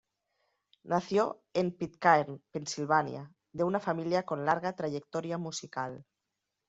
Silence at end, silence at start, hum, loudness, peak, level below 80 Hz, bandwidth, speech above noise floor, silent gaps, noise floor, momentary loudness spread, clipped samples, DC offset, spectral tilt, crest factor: 0.65 s; 0.85 s; none; -32 LUFS; -10 dBFS; -72 dBFS; 8 kHz; 55 dB; none; -86 dBFS; 12 LU; under 0.1%; under 0.1%; -4.5 dB/octave; 22 dB